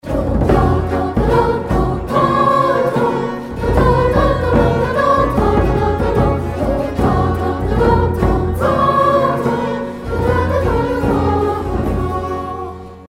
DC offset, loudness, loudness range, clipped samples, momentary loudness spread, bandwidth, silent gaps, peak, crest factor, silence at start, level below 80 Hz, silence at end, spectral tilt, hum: under 0.1%; -16 LUFS; 2 LU; under 0.1%; 8 LU; 15 kHz; none; 0 dBFS; 14 dB; 0.05 s; -24 dBFS; 0.05 s; -8 dB/octave; none